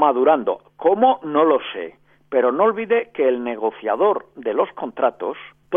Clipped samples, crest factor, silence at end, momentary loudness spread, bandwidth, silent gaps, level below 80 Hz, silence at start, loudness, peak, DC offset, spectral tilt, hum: under 0.1%; 16 dB; 0 s; 12 LU; 3.7 kHz; none; -66 dBFS; 0 s; -20 LUFS; -2 dBFS; under 0.1%; -8.5 dB/octave; none